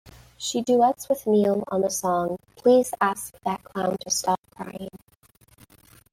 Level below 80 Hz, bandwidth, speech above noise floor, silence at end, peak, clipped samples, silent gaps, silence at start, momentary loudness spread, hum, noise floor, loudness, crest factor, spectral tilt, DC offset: -62 dBFS; 16 kHz; 35 dB; 1.15 s; -8 dBFS; under 0.1%; 4.39-4.43 s; 0.4 s; 14 LU; none; -59 dBFS; -24 LUFS; 18 dB; -4 dB/octave; under 0.1%